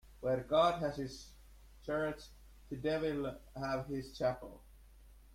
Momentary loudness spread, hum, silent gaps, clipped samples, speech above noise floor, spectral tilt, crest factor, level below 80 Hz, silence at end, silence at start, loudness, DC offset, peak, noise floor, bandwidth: 20 LU; none; none; under 0.1%; 23 dB; -6 dB/octave; 20 dB; -58 dBFS; 0 s; 0.05 s; -37 LUFS; under 0.1%; -18 dBFS; -59 dBFS; 16 kHz